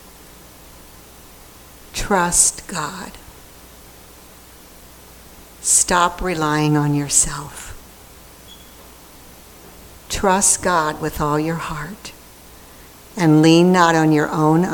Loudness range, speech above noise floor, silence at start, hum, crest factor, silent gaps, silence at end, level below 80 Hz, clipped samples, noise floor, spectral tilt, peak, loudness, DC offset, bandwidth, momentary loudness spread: 6 LU; 26 dB; 1.95 s; none; 20 dB; none; 0 s; -40 dBFS; under 0.1%; -43 dBFS; -4 dB/octave; 0 dBFS; -16 LUFS; under 0.1%; 19 kHz; 20 LU